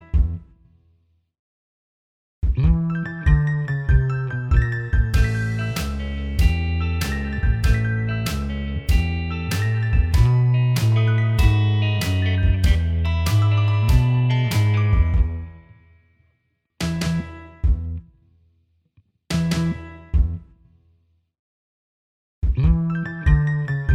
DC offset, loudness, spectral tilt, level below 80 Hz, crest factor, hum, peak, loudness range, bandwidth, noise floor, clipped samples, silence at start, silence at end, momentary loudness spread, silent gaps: under 0.1%; -21 LUFS; -6.5 dB/octave; -24 dBFS; 16 dB; none; -4 dBFS; 9 LU; 16.5 kHz; -70 dBFS; under 0.1%; 0.15 s; 0 s; 9 LU; 1.39-2.42 s, 21.39-22.42 s